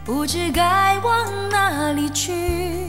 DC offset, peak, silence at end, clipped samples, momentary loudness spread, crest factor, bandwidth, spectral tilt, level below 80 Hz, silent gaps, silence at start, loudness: under 0.1%; -6 dBFS; 0 s; under 0.1%; 6 LU; 14 dB; 17 kHz; -3.5 dB/octave; -36 dBFS; none; 0 s; -19 LUFS